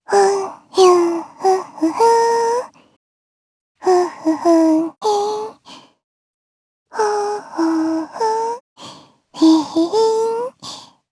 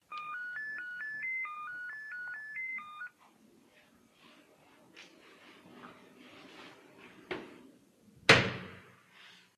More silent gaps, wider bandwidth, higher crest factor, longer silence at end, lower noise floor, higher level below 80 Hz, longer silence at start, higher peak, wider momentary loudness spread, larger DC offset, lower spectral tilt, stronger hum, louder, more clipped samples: first, 2.96-3.75 s, 6.04-6.86 s, 8.60-8.76 s vs none; second, 11 kHz vs 13 kHz; second, 16 dB vs 32 dB; about the same, 0.3 s vs 0.2 s; second, -43 dBFS vs -64 dBFS; about the same, -70 dBFS vs -70 dBFS; about the same, 0.1 s vs 0.1 s; first, 0 dBFS vs -6 dBFS; second, 17 LU vs 28 LU; neither; about the same, -3.5 dB/octave vs -3.5 dB/octave; neither; first, -17 LUFS vs -33 LUFS; neither